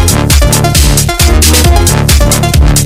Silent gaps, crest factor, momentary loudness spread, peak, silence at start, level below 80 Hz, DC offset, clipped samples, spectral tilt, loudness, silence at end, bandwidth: none; 6 dB; 2 LU; 0 dBFS; 0 s; -10 dBFS; under 0.1%; 3%; -4 dB/octave; -7 LUFS; 0 s; 16.5 kHz